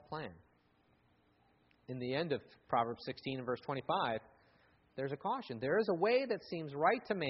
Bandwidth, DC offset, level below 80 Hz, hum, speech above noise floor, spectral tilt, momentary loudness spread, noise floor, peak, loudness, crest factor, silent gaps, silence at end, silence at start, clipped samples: 5.8 kHz; under 0.1%; -74 dBFS; none; 36 dB; -4 dB/octave; 11 LU; -72 dBFS; -18 dBFS; -37 LUFS; 20 dB; none; 0 s; 0.1 s; under 0.1%